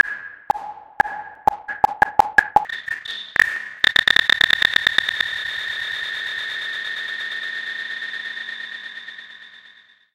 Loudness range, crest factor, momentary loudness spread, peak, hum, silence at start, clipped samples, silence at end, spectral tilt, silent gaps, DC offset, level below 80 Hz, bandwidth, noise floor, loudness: 10 LU; 22 dB; 16 LU; 0 dBFS; none; 0.05 s; under 0.1%; 0.45 s; -1 dB/octave; none; under 0.1%; -54 dBFS; 17 kHz; -50 dBFS; -20 LUFS